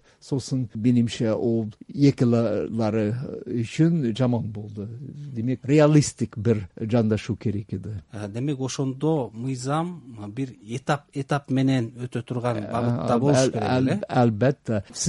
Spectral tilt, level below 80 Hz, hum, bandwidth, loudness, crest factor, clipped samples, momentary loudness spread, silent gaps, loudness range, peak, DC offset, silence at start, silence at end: -6.5 dB/octave; -56 dBFS; none; 11.5 kHz; -24 LUFS; 18 dB; under 0.1%; 13 LU; none; 5 LU; -6 dBFS; under 0.1%; 0.25 s; 0 s